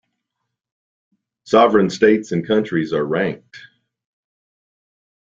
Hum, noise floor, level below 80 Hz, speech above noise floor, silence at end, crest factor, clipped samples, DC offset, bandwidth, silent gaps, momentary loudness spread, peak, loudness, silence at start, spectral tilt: none; -77 dBFS; -60 dBFS; 61 dB; 1.7 s; 20 dB; under 0.1%; under 0.1%; 7.8 kHz; none; 8 LU; -2 dBFS; -17 LUFS; 1.45 s; -6 dB/octave